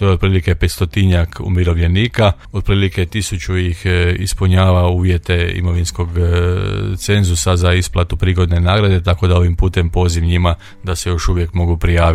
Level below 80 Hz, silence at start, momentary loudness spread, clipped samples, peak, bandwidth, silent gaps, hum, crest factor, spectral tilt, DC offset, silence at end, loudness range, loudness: -26 dBFS; 0 s; 5 LU; under 0.1%; 0 dBFS; 14 kHz; none; none; 12 dB; -6 dB/octave; under 0.1%; 0 s; 1 LU; -15 LUFS